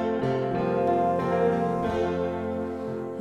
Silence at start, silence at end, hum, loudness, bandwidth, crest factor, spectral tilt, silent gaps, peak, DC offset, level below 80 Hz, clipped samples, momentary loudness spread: 0 s; 0 s; none; -26 LUFS; 11 kHz; 14 dB; -8 dB/octave; none; -12 dBFS; under 0.1%; -52 dBFS; under 0.1%; 7 LU